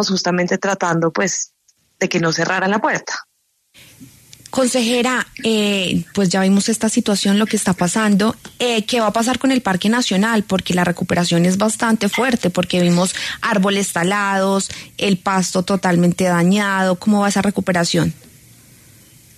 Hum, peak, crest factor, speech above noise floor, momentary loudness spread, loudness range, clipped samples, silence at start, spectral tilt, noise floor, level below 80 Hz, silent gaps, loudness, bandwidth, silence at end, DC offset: none; -4 dBFS; 14 dB; 41 dB; 4 LU; 3 LU; under 0.1%; 0 s; -4.5 dB/octave; -58 dBFS; -52 dBFS; none; -17 LUFS; 13.5 kHz; 1.25 s; under 0.1%